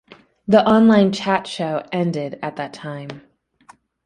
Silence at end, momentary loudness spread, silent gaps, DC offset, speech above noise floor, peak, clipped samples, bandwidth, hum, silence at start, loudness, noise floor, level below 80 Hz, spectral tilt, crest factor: 0.85 s; 19 LU; none; under 0.1%; 33 dB; -2 dBFS; under 0.1%; 9.8 kHz; none; 0.5 s; -18 LUFS; -51 dBFS; -58 dBFS; -6.5 dB/octave; 18 dB